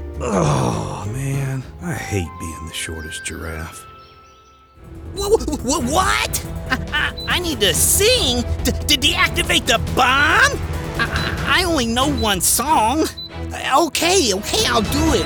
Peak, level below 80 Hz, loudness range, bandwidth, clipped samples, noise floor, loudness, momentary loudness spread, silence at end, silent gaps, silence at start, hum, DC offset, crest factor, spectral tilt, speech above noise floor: -2 dBFS; -32 dBFS; 11 LU; over 20 kHz; under 0.1%; -48 dBFS; -17 LUFS; 14 LU; 0 s; none; 0 s; none; under 0.1%; 16 dB; -3 dB/octave; 30 dB